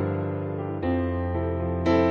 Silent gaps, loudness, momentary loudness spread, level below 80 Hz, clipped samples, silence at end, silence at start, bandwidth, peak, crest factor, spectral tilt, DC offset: none; -27 LUFS; 7 LU; -42 dBFS; under 0.1%; 0 s; 0 s; 6.8 kHz; -10 dBFS; 14 dB; -9 dB/octave; under 0.1%